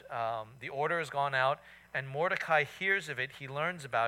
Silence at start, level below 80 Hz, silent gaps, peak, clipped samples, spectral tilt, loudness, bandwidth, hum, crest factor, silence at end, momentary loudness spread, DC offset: 0.05 s; -72 dBFS; none; -14 dBFS; under 0.1%; -4.5 dB/octave; -33 LUFS; 16.5 kHz; none; 18 dB; 0 s; 10 LU; under 0.1%